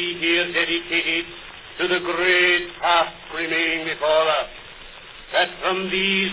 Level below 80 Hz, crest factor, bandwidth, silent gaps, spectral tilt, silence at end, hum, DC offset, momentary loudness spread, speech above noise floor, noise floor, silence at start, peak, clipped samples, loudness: -54 dBFS; 16 dB; 4 kHz; none; -7 dB/octave; 0 s; none; under 0.1%; 19 LU; 20 dB; -41 dBFS; 0 s; -6 dBFS; under 0.1%; -20 LUFS